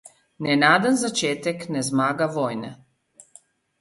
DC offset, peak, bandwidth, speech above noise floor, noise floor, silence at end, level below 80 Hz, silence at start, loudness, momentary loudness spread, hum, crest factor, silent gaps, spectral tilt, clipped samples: under 0.1%; -4 dBFS; 11.5 kHz; 33 dB; -55 dBFS; 1.05 s; -66 dBFS; 0.4 s; -22 LUFS; 13 LU; none; 20 dB; none; -4 dB/octave; under 0.1%